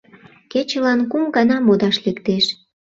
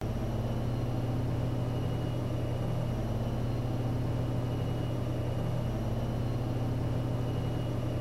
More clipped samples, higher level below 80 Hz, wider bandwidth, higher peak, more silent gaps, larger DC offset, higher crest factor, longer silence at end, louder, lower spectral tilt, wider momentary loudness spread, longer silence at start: neither; second, -60 dBFS vs -42 dBFS; second, 7.6 kHz vs 12.5 kHz; first, -2 dBFS vs -20 dBFS; neither; neither; first, 16 dB vs 10 dB; first, 0.45 s vs 0 s; first, -18 LUFS vs -33 LUFS; second, -5.5 dB/octave vs -8 dB/octave; first, 7 LU vs 1 LU; first, 0.55 s vs 0 s